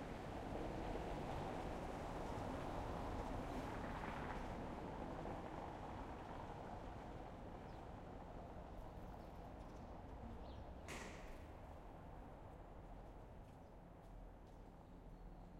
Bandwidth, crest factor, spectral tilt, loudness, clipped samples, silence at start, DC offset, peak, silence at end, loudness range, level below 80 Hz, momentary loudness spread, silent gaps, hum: 16 kHz; 16 dB; -6.5 dB/octave; -52 LUFS; under 0.1%; 0 s; under 0.1%; -34 dBFS; 0 s; 11 LU; -56 dBFS; 12 LU; none; none